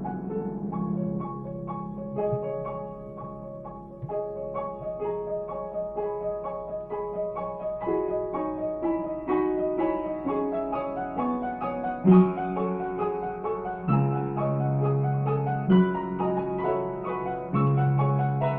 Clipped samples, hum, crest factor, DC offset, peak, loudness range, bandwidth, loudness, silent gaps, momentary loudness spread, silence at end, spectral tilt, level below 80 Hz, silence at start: under 0.1%; none; 20 dB; under 0.1%; -8 dBFS; 8 LU; 3.7 kHz; -28 LUFS; none; 11 LU; 0 s; -12 dB/octave; -52 dBFS; 0 s